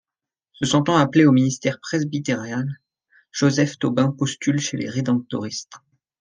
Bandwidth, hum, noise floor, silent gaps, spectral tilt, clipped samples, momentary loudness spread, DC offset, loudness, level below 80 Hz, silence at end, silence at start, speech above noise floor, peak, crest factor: 10 kHz; none; -89 dBFS; none; -5.5 dB/octave; under 0.1%; 12 LU; under 0.1%; -21 LUFS; -62 dBFS; 0.45 s; 0.6 s; 69 dB; -2 dBFS; 18 dB